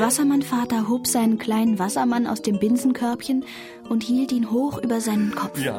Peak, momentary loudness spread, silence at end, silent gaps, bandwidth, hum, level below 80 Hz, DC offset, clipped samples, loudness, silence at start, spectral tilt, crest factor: -6 dBFS; 6 LU; 0 s; none; 17 kHz; none; -60 dBFS; under 0.1%; under 0.1%; -22 LUFS; 0 s; -4.5 dB/octave; 14 dB